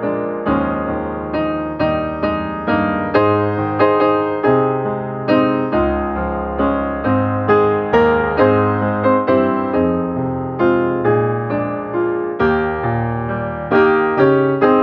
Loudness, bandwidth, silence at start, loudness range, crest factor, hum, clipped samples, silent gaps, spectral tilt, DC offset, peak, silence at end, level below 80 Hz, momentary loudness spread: -17 LUFS; 5.6 kHz; 0 s; 3 LU; 16 dB; none; under 0.1%; none; -10 dB/octave; under 0.1%; 0 dBFS; 0 s; -38 dBFS; 7 LU